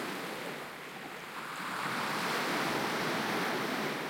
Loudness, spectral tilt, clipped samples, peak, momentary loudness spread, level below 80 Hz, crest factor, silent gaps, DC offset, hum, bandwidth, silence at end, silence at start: -34 LUFS; -3.5 dB/octave; under 0.1%; -20 dBFS; 10 LU; -74 dBFS; 16 dB; none; under 0.1%; none; 16.5 kHz; 0 s; 0 s